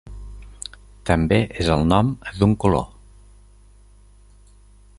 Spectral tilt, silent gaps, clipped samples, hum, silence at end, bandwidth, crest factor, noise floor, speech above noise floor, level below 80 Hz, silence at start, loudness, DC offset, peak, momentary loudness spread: -7 dB/octave; none; under 0.1%; 50 Hz at -40 dBFS; 2.15 s; 11.5 kHz; 22 dB; -49 dBFS; 31 dB; -36 dBFS; 0.05 s; -20 LUFS; under 0.1%; -2 dBFS; 20 LU